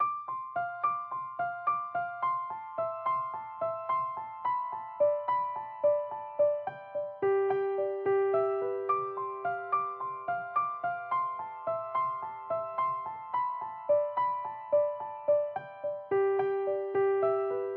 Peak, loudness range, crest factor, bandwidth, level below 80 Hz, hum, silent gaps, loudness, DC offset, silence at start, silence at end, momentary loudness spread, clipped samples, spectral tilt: -18 dBFS; 3 LU; 14 dB; 4.2 kHz; -86 dBFS; none; none; -32 LUFS; under 0.1%; 0 s; 0 s; 8 LU; under 0.1%; -9 dB/octave